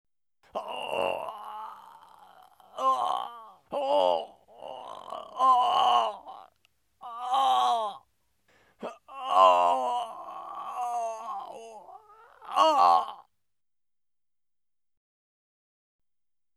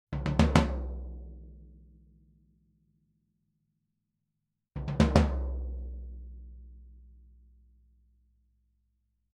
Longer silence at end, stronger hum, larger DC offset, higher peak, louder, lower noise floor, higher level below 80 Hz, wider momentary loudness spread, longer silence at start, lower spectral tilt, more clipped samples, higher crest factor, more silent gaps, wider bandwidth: first, 3.35 s vs 2.35 s; neither; neither; about the same, -6 dBFS vs -4 dBFS; first, -26 LUFS vs -29 LUFS; first, under -90 dBFS vs -84 dBFS; second, -80 dBFS vs -38 dBFS; second, 22 LU vs 26 LU; first, 0.55 s vs 0.1 s; second, -2 dB/octave vs -7 dB/octave; neither; second, 22 dB vs 30 dB; neither; first, 13.5 kHz vs 11.5 kHz